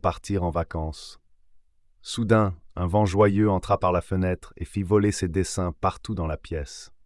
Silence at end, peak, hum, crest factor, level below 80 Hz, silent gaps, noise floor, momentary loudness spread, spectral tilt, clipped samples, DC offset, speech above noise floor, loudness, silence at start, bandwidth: 0.2 s; -8 dBFS; none; 18 dB; -44 dBFS; none; -56 dBFS; 13 LU; -6.5 dB/octave; under 0.1%; under 0.1%; 31 dB; -25 LUFS; 0.05 s; 12 kHz